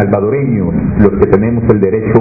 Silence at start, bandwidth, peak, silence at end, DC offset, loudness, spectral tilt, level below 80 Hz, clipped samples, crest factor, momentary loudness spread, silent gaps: 0 s; 2.7 kHz; 0 dBFS; 0 s; under 0.1%; -11 LUFS; -12.5 dB/octave; -26 dBFS; 0.7%; 10 dB; 3 LU; none